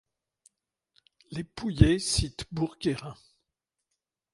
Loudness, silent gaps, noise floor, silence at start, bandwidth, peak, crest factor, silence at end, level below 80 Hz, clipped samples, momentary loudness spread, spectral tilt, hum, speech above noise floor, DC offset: -28 LUFS; none; -85 dBFS; 1.3 s; 11.5 kHz; -4 dBFS; 26 dB; 1.2 s; -40 dBFS; under 0.1%; 16 LU; -5 dB/octave; none; 58 dB; under 0.1%